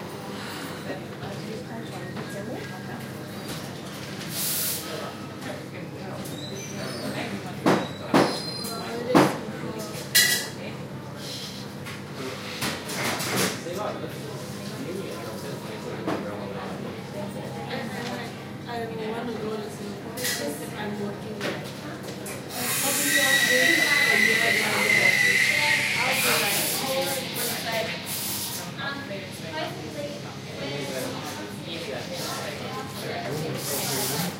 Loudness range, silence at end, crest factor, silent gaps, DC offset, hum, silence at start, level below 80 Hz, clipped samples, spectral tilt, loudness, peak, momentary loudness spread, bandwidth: 13 LU; 0 s; 24 dB; none; under 0.1%; none; 0 s; -62 dBFS; under 0.1%; -3 dB/octave; -26 LUFS; -4 dBFS; 17 LU; 16 kHz